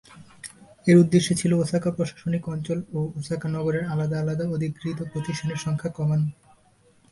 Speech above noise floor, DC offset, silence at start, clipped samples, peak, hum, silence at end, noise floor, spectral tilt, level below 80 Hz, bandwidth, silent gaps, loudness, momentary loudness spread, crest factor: 36 dB; under 0.1%; 0.1 s; under 0.1%; -4 dBFS; none; 0.8 s; -59 dBFS; -6.5 dB/octave; -56 dBFS; 11.5 kHz; none; -25 LUFS; 12 LU; 20 dB